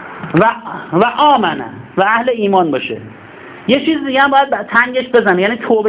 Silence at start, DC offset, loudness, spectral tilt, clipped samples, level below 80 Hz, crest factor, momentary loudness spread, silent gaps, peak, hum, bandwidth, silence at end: 0 s; under 0.1%; -13 LUFS; -9 dB/octave; under 0.1%; -52 dBFS; 14 dB; 12 LU; none; 0 dBFS; none; 4 kHz; 0 s